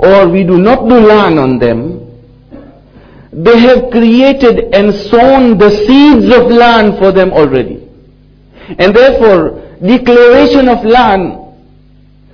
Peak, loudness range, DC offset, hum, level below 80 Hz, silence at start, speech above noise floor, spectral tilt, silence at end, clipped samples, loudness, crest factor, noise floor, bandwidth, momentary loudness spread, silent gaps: 0 dBFS; 4 LU; under 0.1%; none; -30 dBFS; 0 s; 35 dB; -7.5 dB/octave; 0.9 s; 10%; -6 LUFS; 6 dB; -40 dBFS; 5.4 kHz; 8 LU; none